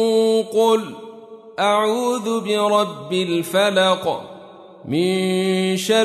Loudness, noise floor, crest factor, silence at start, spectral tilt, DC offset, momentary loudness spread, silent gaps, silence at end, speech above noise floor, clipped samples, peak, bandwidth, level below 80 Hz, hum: -19 LUFS; -41 dBFS; 14 dB; 0 s; -4.5 dB/octave; under 0.1%; 15 LU; none; 0 s; 23 dB; under 0.1%; -4 dBFS; 13.5 kHz; -70 dBFS; none